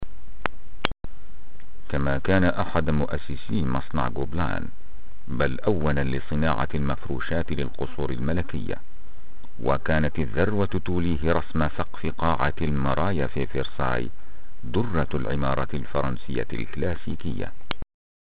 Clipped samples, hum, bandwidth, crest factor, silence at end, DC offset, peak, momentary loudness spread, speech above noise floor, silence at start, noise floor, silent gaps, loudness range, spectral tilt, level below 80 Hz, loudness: under 0.1%; none; 5 kHz; 24 dB; 0.35 s; 9%; -2 dBFS; 10 LU; 21 dB; 0 s; -47 dBFS; none; 3 LU; -6 dB/octave; -38 dBFS; -27 LUFS